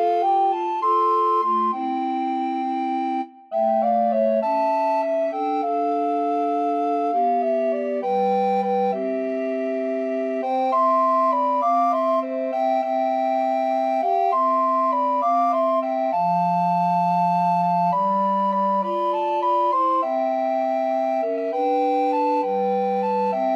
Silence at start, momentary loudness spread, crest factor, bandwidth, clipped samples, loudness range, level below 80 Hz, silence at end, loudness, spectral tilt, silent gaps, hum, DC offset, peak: 0 s; 5 LU; 10 dB; 7.4 kHz; under 0.1%; 2 LU; -86 dBFS; 0 s; -21 LUFS; -8 dB/octave; none; none; under 0.1%; -10 dBFS